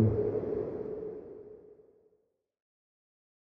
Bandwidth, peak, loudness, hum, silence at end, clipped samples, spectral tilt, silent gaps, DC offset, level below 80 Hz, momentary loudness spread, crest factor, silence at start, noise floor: 2.7 kHz; -14 dBFS; -35 LUFS; none; 1.8 s; under 0.1%; -12 dB/octave; none; under 0.1%; -56 dBFS; 20 LU; 22 dB; 0 s; -75 dBFS